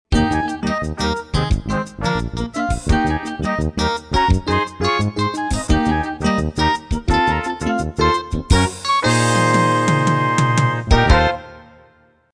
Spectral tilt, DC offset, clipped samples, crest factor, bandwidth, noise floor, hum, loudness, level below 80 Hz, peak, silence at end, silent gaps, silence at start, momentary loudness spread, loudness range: -5.5 dB/octave; under 0.1%; under 0.1%; 18 dB; 11 kHz; -53 dBFS; none; -18 LUFS; -26 dBFS; 0 dBFS; 0.7 s; none; 0.1 s; 7 LU; 5 LU